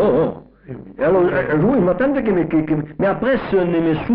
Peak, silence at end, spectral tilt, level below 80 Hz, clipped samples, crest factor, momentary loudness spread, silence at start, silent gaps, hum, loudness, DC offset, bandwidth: -8 dBFS; 0 s; -7 dB/octave; -42 dBFS; under 0.1%; 10 dB; 11 LU; 0 s; none; none; -18 LUFS; under 0.1%; 5.2 kHz